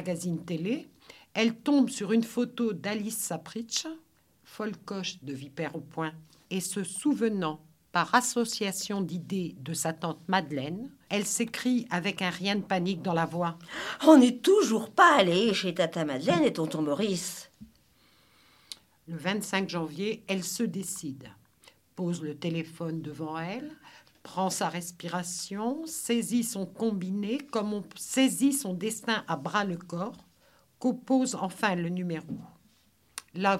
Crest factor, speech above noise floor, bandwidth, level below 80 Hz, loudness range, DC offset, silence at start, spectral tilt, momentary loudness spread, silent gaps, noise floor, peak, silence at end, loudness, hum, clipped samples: 24 dB; 37 dB; 16 kHz; -72 dBFS; 11 LU; under 0.1%; 0 s; -4.5 dB/octave; 13 LU; none; -66 dBFS; -6 dBFS; 0 s; -29 LUFS; none; under 0.1%